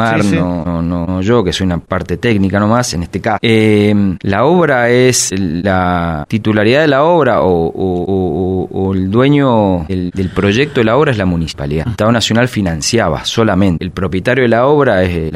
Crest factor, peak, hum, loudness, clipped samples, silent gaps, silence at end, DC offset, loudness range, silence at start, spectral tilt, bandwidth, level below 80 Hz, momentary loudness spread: 12 dB; 0 dBFS; none; -12 LUFS; under 0.1%; none; 0 s; under 0.1%; 2 LU; 0 s; -5.5 dB/octave; 15.5 kHz; -34 dBFS; 7 LU